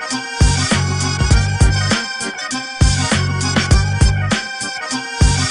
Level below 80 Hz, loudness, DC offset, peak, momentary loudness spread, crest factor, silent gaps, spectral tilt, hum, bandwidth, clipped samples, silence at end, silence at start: -20 dBFS; -16 LUFS; under 0.1%; 0 dBFS; 8 LU; 14 dB; none; -4 dB/octave; none; 11 kHz; under 0.1%; 0 s; 0 s